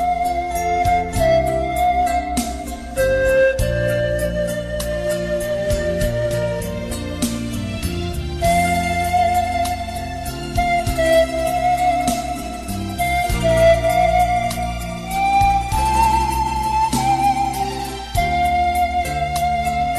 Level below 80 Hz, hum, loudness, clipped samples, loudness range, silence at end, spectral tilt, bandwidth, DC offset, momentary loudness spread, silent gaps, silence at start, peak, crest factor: -30 dBFS; none; -19 LUFS; under 0.1%; 4 LU; 0 s; -5 dB/octave; 13.5 kHz; under 0.1%; 9 LU; none; 0 s; -4 dBFS; 14 dB